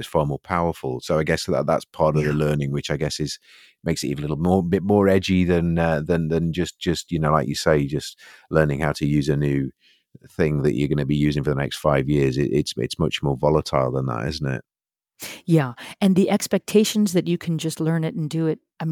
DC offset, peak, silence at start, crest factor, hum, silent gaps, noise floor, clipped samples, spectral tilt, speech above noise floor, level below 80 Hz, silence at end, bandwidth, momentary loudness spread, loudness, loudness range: under 0.1%; -2 dBFS; 0 s; 20 dB; none; none; -83 dBFS; under 0.1%; -6 dB/octave; 62 dB; -42 dBFS; 0 s; 17 kHz; 8 LU; -22 LUFS; 3 LU